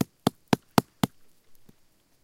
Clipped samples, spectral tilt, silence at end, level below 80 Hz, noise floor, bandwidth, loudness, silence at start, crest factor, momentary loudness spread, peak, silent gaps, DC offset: under 0.1%; -5.5 dB/octave; 1.2 s; -58 dBFS; -63 dBFS; 17 kHz; -28 LUFS; 0 s; 28 dB; 6 LU; -2 dBFS; none; under 0.1%